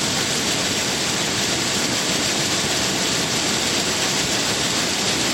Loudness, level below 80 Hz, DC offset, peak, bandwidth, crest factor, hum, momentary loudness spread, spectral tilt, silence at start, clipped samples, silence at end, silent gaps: -19 LUFS; -48 dBFS; under 0.1%; -8 dBFS; 16.5 kHz; 14 dB; none; 1 LU; -1.5 dB/octave; 0 s; under 0.1%; 0 s; none